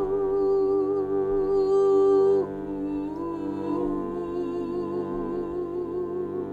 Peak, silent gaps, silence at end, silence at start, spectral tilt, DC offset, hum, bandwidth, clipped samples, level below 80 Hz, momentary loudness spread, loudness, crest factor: -12 dBFS; none; 0 s; 0 s; -9 dB/octave; under 0.1%; none; 5 kHz; under 0.1%; -50 dBFS; 11 LU; -26 LUFS; 12 dB